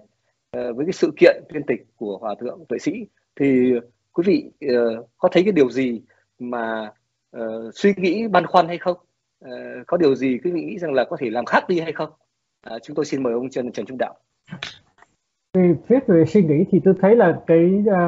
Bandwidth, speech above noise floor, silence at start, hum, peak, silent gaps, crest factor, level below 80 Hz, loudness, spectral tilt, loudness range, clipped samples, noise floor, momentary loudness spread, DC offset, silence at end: 7.8 kHz; 46 dB; 0.55 s; none; 0 dBFS; none; 20 dB; -64 dBFS; -20 LUFS; -6 dB/octave; 6 LU; under 0.1%; -66 dBFS; 17 LU; under 0.1%; 0 s